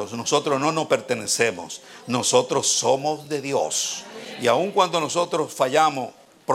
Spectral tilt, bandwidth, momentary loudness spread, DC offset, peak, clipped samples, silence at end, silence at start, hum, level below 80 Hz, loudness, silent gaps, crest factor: -2.5 dB/octave; 16.5 kHz; 13 LU; under 0.1%; -4 dBFS; under 0.1%; 0 s; 0 s; none; -72 dBFS; -22 LUFS; none; 20 dB